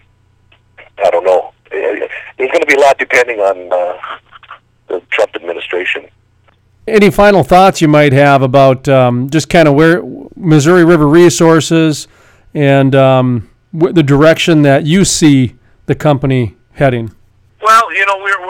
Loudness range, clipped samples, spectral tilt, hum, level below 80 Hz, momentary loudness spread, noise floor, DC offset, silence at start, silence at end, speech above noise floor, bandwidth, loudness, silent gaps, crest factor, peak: 6 LU; 2%; -5.5 dB/octave; none; -38 dBFS; 14 LU; -51 dBFS; under 0.1%; 1 s; 0 s; 42 dB; 17 kHz; -9 LUFS; none; 10 dB; 0 dBFS